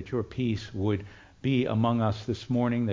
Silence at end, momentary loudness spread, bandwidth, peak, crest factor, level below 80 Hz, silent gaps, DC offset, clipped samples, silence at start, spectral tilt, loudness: 0 s; 8 LU; 7.6 kHz; -12 dBFS; 16 dB; -50 dBFS; none; under 0.1%; under 0.1%; 0 s; -8 dB/octave; -29 LUFS